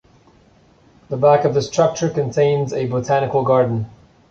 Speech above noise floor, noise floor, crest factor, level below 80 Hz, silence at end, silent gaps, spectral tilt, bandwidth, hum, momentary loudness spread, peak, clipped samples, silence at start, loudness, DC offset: 35 dB; -52 dBFS; 16 dB; -52 dBFS; 0.4 s; none; -6.5 dB/octave; 7.6 kHz; none; 7 LU; -2 dBFS; under 0.1%; 1.1 s; -18 LUFS; under 0.1%